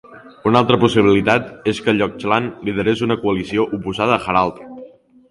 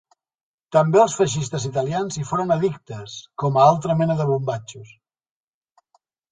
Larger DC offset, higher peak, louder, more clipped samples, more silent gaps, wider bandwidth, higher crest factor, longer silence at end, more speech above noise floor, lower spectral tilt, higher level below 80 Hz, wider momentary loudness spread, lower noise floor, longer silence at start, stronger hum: neither; about the same, 0 dBFS vs -2 dBFS; first, -17 LUFS vs -20 LUFS; neither; neither; first, 11.5 kHz vs 9.6 kHz; about the same, 18 dB vs 18 dB; second, 0.45 s vs 1.45 s; second, 25 dB vs 46 dB; about the same, -6.5 dB/octave vs -6 dB/octave; first, -46 dBFS vs -58 dBFS; second, 9 LU vs 17 LU; second, -42 dBFS vs -66 dBFS; second, 0.1 s vs 0.7 s; neither